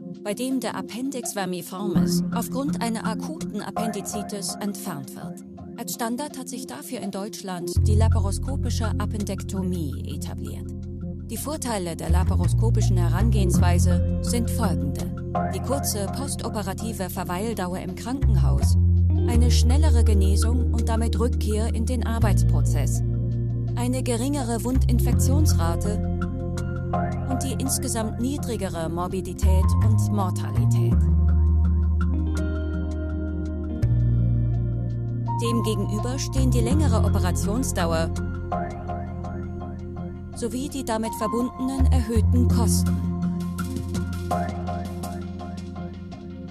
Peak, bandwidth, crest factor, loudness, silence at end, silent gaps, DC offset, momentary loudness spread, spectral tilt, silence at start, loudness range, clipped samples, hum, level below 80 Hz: -8 dBFS; 14.5 kHz; 16 dB; -24 LUFS; 0 s; none; under 0.1%; 12 LU; -6.5 dB/octave; 0 s; 8 LU; under 0.1%; none; -28 dBFS